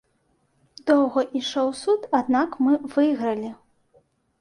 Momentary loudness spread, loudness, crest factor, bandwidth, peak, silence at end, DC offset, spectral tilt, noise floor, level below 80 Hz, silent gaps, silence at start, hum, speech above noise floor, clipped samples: 8 LU; -23 LUFS; 18 dB; 11 kHz; -6 dBFS; 0.85 s; under 0.1%; -4.5 dB/octave; -68 dBFS; -68 dBFS; none; 0.85 s; none; 46 dB; under 0.1%